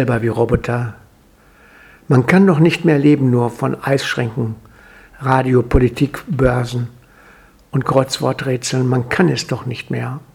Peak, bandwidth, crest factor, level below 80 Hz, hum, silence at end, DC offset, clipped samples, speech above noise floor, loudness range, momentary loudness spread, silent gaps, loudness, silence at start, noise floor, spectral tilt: 0 dBFS; 14.5 kHz; 16 dB; -34 dBFS; none; 0.15 s; under 0.1%; under 0.1%; 34 dB; 4 LU; 11 LU; none; -16 LUFS; 0 s; -49 dBFS; -6.5 dB/octave